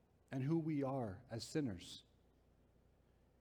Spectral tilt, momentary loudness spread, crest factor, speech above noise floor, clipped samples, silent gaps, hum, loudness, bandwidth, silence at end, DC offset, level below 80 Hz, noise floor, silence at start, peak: -6.5 dB/octave; 13 LU; 16 dB; 31 dB; under 0.1%; none; none; -43 LUFS; 17 kHz; 1.4 s; under 0.1%; -74 dBFS; -73 dBFS; 0.3 s; -28 dBFS